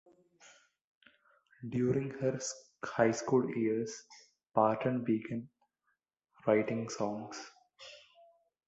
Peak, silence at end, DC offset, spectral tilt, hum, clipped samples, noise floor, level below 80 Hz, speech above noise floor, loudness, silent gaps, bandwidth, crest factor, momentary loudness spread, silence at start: -12 dBFS; 0.7 s; under 0.1%; -6 dB/octave; none; under 0.1%; -82 dBFS; -72 dBFS; 49 dB; -34 LUFS; 0.81-1.01 s; 8.2 kHz; 22 dB; 18 LU; 0.45 s